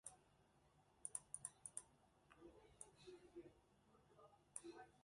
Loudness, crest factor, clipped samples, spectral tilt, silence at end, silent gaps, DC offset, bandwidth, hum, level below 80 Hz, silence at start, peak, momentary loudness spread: -57 LUFS; 30 dB; under 0.1%; -2.5 dB/octave; 0 s; none; under 0.1%; 11.5 kHz; none; -84 dBFS; 0.05 s; -32 dBFS; 15 LU